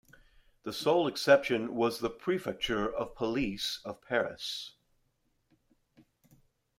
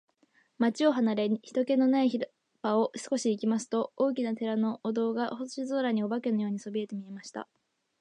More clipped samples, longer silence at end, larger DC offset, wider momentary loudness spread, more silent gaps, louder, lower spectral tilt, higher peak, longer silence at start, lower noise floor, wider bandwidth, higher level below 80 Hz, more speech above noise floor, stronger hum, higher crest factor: neither; first, 2.1 s vs 0.55 s; neither; about the same, 14 LU vs 13 LU; neither; about the same, -31 LUFS vs -30 LUFS; about the same, -4.5 dB/octave vs -5.5 dB/octave; first, -10 dBFS vs -14 dBFS; about the same, 0.65 s vs 0.6 s; first, -75 dBFS vs -68 dBFS; first, 16 kHz vs 10.5 kHz; first, -60 dBFS vs -84 dBFS; first, 44 dB vs 39 dB; neither; first, 24 dB vs 16 dB